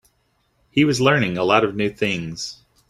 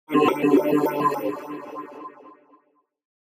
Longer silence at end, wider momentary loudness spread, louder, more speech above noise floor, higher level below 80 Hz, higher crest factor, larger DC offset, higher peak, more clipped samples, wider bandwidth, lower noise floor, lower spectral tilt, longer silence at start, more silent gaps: second, 0.35 s vs 0.95 s; second, 13 LU vs 20 LU; first, -19 LUFS vs -22 LUFS; first, 47 dB vs 42 dB; first, -54 dBFS vs -74 dBFS; about the same, 20 dB vs 18 dB; neither; first, -2 dBFS vs -6 dBFS; neither; second, 13.5 kHz vs 15 kHz; about the same, -66 dBFS vs -64 dBFS; second, -5 dB/octave vs -6.5 dB/octave; first, 0.75 s vs 0.1 s; neither